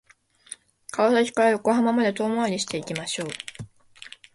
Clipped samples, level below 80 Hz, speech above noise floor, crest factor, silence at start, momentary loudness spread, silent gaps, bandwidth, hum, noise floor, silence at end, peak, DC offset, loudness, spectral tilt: under 0.1%; -66 dBFS; 24 dB; 18 dB; 0.5 s; 22 LU; none; 11.5 kHz; none; -47 dBFS; 0.25 s; -8 dBFS; under 0.1%; -23 LUFS; -4 dB/octave